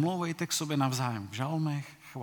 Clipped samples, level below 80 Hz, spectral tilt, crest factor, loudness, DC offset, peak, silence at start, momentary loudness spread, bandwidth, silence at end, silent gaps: under 0.1%; -76 dBFS; -5 dB/octave; 18 dB; -32 LUFS; under 0.1%; -14 dBFS; 0 s; 7 LU; 19.5 kHz; 0 s; none